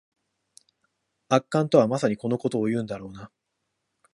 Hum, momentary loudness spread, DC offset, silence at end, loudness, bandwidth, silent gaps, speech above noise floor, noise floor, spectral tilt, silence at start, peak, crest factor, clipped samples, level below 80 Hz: none; 16 LU; under 0.1%; 0.85 s; -24 LUFS; 11.5 kHz; none; 55 dB; -79 dBFS; -6.5 dB/octave; 1.3 s; -4 dBFS; 24 dB; under 0.1%; -66 dBFS